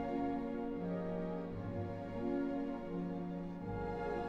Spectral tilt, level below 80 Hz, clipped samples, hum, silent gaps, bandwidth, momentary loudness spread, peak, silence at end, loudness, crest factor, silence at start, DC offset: -9.5 dB/octave; -56 dBFS; under 0.1%; 50 Hz at -60 dBFS; none; 7 kHz; 5 LU; -28 dBFS; 0 s; -41 LUFS; 12 dB; 0 s; under 0.1%